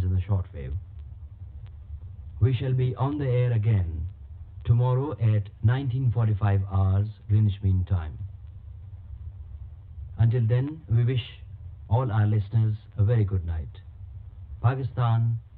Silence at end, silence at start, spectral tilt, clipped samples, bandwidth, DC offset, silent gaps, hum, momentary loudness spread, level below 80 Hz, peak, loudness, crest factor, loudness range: 0 s; 0 s; -12 dB/octave; under 0.1%; 4.1 kHz; under 0.1%; none; none; 20 LU; -42 dBFS; -10 dBFS; -26 LUFS; 16 dB; 4 LU